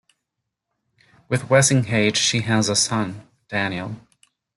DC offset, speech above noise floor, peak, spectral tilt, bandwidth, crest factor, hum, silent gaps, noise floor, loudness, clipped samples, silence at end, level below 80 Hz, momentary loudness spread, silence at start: under 0.1%; 61 dB; -2 dBFS; -3.5 dB/octave; 12 kHz; 20 dB; none; none; -81 dBFS; -20 LUFS; under 0.1%; 0.55 s; -58 dBFS; 15 LU; 1.3 s